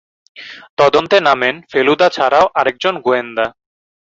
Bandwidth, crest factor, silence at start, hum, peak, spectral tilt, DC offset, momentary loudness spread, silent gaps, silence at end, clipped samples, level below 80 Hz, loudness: 7.8 kHz; 14 dB; 0.35 s; none; 0 dBFS; -4.5 dB/octave; under 0.1%; 10 LU; 0.70-0.77 s; 0.65 s; under 0.1%; -56 dBFS; -14 LUFS